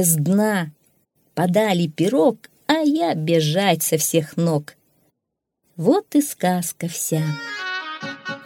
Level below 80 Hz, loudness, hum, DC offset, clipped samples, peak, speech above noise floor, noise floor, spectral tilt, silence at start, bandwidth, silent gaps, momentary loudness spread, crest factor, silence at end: -70 dBFS; -20 LUFS; none; under 0.1%; under 0.1%; -2 dBFS; 60 dB; -79 dBFS; -4.5 dB/octave; 0 s; 18.5 kHz; none; 9 LU; 18 dB; 0 s